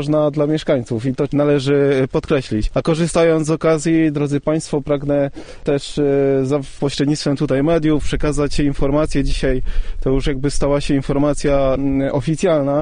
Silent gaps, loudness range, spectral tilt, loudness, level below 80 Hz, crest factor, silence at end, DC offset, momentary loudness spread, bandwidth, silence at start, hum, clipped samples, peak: none; 2 LU; -6.5 dB/octave; -18 LUFS; -26 dBFS; 14 dB; 0 s; under 0.1%; 5 LU; 10 kHz; 0 s; none; under 0.1%; -2 dBFS